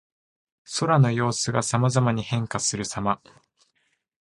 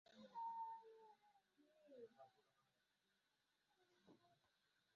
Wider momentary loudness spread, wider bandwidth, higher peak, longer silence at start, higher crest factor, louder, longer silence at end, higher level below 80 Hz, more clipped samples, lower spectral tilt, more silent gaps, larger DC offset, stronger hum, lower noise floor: second, 8 LU vs 17 LU; first, 11.5 kHz vs 6.8 kHz; first, -4 dBFS vs -46 dBFS; first, 0.7 s vs 0.05 s; about the same, 20 dB vs 16 dB; first, -24 LUFS vs -56 LUFS; first, 1.05 s vs 0.6 s; first, -56 dBFS vs under -90 dBFS; neither; first, -5 dB/octave vs -3 dB/octave; neither; neither; neither; second, -72 dBFS vs -88 dBFS